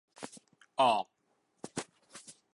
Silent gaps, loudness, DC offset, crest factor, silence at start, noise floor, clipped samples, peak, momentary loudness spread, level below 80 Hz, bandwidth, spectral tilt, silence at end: none; -32 LUFS; under 0.1%; 22 dB; 0.2 s; -76 dBFS; under 0.1%; -14 dBFS; 23 LU; -84 dBFS; 11.5 kHz; -3 dB/octave; 0.25 s